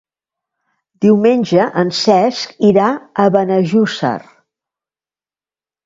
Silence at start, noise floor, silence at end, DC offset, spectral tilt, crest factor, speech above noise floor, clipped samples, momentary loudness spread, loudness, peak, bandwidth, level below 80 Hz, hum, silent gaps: 1 s; under -90 dBFS; 1.65 s; under 0.1%; -6 dB/octave; 14 dB; over 77 dB; under 0.1%; 6 LU; -14 LUFS; 0 dBFS; 7.8 kHz; -60 dBFS; none; none